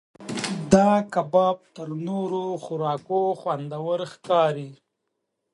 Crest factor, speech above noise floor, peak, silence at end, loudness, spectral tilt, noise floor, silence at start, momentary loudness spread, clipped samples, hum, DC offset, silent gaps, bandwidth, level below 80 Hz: 24 dB; 55 dB; -2 dBFS; 0.8 s; -24 LUFS; -6 dB/octave; -79 dBFS; 0.2 s; 13 LU; under 0.1%; none; under 0.1%; none; 11.5 kHz; -56 dBFS